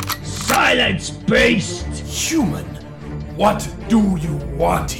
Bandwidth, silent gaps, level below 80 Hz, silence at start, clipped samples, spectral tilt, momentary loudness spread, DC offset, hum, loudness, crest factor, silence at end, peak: 18 kHz; none; -32 dBFS; 0 s; under 0.1%; -4 dB/octave; 15 LU; under 0.1%; none; -18 LUFS; 16 dB; 0 s; -2 dBFS